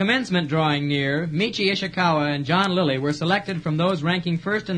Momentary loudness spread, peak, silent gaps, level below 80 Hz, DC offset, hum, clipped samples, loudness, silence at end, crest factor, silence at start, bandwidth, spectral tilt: 3 LU; -4 dBFS; none; -56 dBFS; under 0.1%; none; under 0.1%; -22 LUFS; 0 s; 18 dB; 0 s; 10 kHz; -6 dB/octave